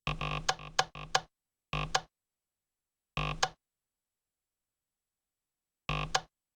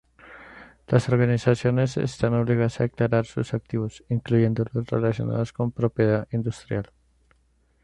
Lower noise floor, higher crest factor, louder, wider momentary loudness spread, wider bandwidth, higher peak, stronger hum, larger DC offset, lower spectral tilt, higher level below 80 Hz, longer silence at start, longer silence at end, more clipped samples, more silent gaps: first, under -90 dBFS vs -64 dBFS; first, 28 dB vs 20 dB; second, -35 LUFS vs -24 LUFS; second, 5 LU vs 8 LU; first, over 20 kHz vs 9.6 kHz; second, -10 dBFS vs -4 dBFS; neither; neither; second, -2.5 dB/octave vs -8 dB/octave; about the same, -50 dBFS vs -52 dBFS; second, 0.05 s vs 0.25 s; second, 0.3 s vs 1 s; neither; neither